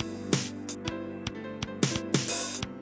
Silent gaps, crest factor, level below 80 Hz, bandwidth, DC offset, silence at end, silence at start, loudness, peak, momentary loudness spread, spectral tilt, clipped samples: none; 24 dB; -54 dBFS; 8 kHz; under 0.1%; 0 s; 0 s; -32 LUFS; -10 dBFS; 9 LU; -4 dB/octave; under 0.1%